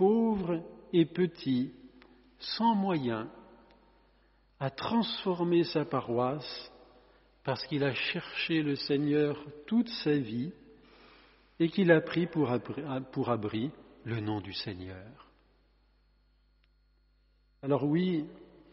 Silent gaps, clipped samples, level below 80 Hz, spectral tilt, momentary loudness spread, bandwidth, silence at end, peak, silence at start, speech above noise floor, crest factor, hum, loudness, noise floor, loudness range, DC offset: none; under 0.1%; -66 dBFS; -5 dB/octave; 13 LU; 5.8 kHz; 0.3 s; -8 dBFS; 0 s; 37 dB; 24 dB; 50 Hz at -65 dBFS; -31 LUFS; -68 dBFS; 8 LU; under 0.1%